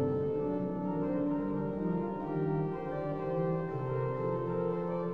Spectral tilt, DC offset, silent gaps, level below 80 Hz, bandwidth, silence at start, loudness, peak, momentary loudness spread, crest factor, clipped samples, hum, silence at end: -11 dB/octave; 0.2%; none; -58 dBFS; 5 kHz; 0 s; -34 LUFS; -20 dBFS; 3 LU; 12 dB; under 0.1%; none; 0 s